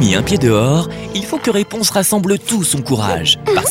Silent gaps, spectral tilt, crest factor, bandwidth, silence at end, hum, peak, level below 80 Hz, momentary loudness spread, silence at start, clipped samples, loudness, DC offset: none; -4 dB/octave; 14 dB; 16.5 kHz; 0 s; none; 0 dBFS; -40 dBFS; 5 LU; 0 s; under 0.1%; -15 LUFS; under 0.1%